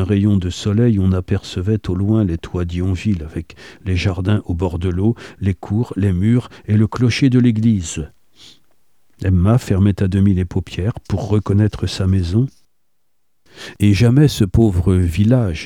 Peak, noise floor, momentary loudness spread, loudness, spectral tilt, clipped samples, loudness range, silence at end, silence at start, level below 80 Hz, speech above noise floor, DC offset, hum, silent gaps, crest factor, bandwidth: -2 dBFS; -73 dBFS; 9 LU; -17 LUFS; -7.5 dB/octave; under 0.1%; 3 LU; 0 s; 0 s; -36 dBFS; 57 dB; 0.3%; none; none; 14 dB; 12.5 kHz